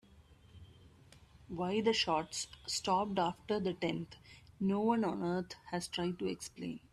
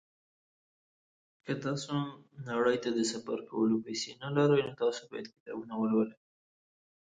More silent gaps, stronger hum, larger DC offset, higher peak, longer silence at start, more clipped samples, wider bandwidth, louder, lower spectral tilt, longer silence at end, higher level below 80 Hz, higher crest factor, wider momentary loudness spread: second, none vs 5.40-5.46 s; neither; neither; second, -20 dBFS vs -16 dBFS; second, 0.15 s vs 1.45 s; neither; first, 13.5 kHz vs 9.4 kHz; second, -36 LUFS vs -32 LUFS; about the same, -4.5 dB/octave vs -5.5 dB/octave; second, 0.15 s vs 0.9 s; first, -66 dBFS vs -74 dBFS; about the same, 18 dB vs 18 dB; second, 11 LU vs 15 LU